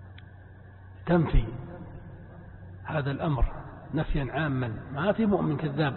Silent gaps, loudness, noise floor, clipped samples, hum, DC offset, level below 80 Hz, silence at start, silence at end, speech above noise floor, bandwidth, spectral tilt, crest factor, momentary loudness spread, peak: none; -29 LUFS; -48 dBFS; under 0.1%; none; under 0.1%; -36 dBFS; 0 s; 0 s; 22 dB; 4.3 kHz; -11.5 dB/octave; 18 dB; 23 LU; -10 dBFS